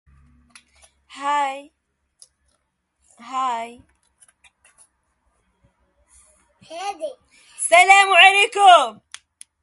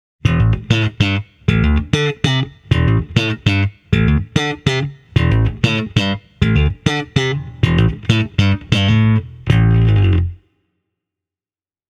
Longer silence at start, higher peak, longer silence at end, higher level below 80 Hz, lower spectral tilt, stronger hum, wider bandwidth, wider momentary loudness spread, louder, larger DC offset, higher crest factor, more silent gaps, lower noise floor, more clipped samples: first, 1.15 s vs 0.25 s; about the same, 0 dBFS vs 0 dBFS; second, 0.7 s vs 1.55 s; second, -66 dBFS vs -26 dBFS; second, 1 dB/octave vs -6.5 dB/octave; neither; first, 11.5 kHz vs 9 kHz; first, 23 LU vs 6 LU; about the same, -15 LUFS vs -16 LUFS; neither; about the same, 20 dB vs 16 dB; neither; second, -71 dBFS vs under -90 dBFS; neither